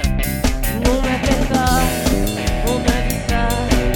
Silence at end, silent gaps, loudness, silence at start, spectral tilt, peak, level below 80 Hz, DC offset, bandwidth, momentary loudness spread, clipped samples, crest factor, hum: 0 s; none; -18 LUFS; 0 s; -5 dB/octave; 0 dBFS; -22 dBFS; under 0.1%; 17.5 kHz; 4 LU; under 0.1%; 16 dB; none